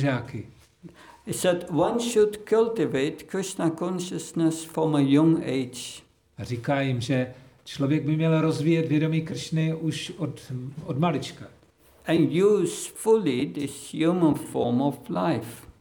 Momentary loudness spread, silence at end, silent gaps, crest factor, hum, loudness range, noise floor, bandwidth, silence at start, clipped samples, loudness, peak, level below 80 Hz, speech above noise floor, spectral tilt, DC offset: 14 LU; 0.1 s; none; 16 dB; none; 3 LU; -57 dBFS; over 20 kHz; 0 s; under 0.1%; -25 LUFS; -10 dBFS; -62 dBFS; 32 dB; -6 dB/octave; under 0.1%